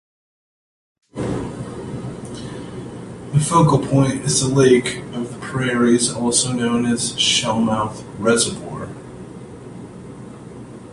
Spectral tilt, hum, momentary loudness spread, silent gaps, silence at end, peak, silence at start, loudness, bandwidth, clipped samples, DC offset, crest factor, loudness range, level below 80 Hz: -4.5 dB/octave; none; 22 LU; none; 0 s; -2 dBFS; 1.15 s; -18 LUFS; 11.5 kHz; under 0.1%; under 0.1%; 18 dB; 7 LU; -48 dBFS